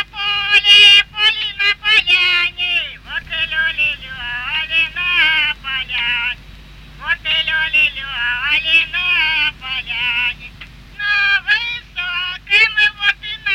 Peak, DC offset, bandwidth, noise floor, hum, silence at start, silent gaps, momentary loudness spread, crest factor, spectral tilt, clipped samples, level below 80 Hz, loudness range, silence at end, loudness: 0 dBFS; under 0.1%; 16 kHz; -38 dBFS; none; 0 s; none; 12 LU; 16 dB; -0.5 dB/octave; under 0.1%; -42 dBFS; 6 LU; 0 s; -13 LUFS